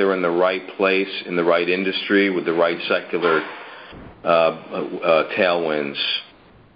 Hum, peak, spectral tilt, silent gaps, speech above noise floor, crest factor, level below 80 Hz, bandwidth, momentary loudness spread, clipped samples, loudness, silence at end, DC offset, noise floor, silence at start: none; -2 dBFS; -9.5 dB/octave; none; 29 dB; 18 dB; -60 dBFS; 5.4 kHz; 10 LU; under 0.1%; -20 LUFS; 0.5 s; under 0.1%; -49 dBFS; 0 s